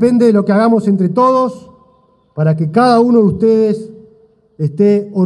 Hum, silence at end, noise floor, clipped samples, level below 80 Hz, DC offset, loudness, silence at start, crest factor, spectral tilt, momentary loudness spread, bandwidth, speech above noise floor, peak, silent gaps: none; 0 s; -52 dBFS; under 0.1%; -52 dBFS; under 0.1%; -12 LUFS; 0 s; 12 dB; -8.5 dB/octave; 11 LU; 11 kHz; 41 dB; 0 dBFS; none